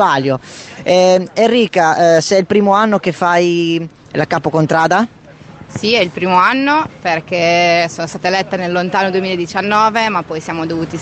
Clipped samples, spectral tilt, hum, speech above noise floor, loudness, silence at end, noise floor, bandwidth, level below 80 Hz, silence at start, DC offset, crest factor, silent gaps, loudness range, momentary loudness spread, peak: under 0.1%; -5 dB/octave; none; 23 dB; -13 LUFS; 0 s; -36 dBFS; 9 kHz; -52 dBFS; 0 s; under 0.1%; 14 dB; none; 3 LU; 9 LU; 0 dBFS